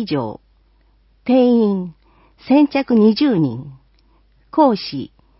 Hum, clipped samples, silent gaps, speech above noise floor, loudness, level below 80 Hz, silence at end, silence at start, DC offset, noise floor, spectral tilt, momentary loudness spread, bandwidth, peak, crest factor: none; under 0.1%; none; 40 dB; -16 LUFS; -54 dBFS; 0.35 s; 0 s; under 0.1%; -55 dBFS; -11 dB/octave; 16 LU; 5.8 kHz; -2 dBFS; 16 dB